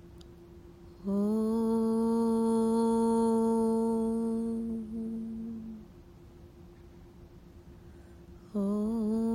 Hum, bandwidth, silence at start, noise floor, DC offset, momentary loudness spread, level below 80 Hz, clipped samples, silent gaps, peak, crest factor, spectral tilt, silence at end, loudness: none; 11.5 kHz; 0.05 s; -52 dBFS; under 0.1%; 12 LU; -56 dBFS; under 0.1%; none; -18 dBFS; 12 dB; -8 dB/octave; 0 s; -30 LUFS